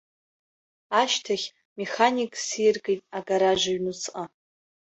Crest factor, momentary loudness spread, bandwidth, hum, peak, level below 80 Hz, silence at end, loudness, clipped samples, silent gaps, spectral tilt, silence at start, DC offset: 22 dB; 12 LU; 8.2 kHz; none; -4 dBFS; -66 dBFS; 0.7 s; -25 LUFS; under 0.1%; 1.65-1.76 s; -2.5 dB/octave; 0.9 s; under 0.1%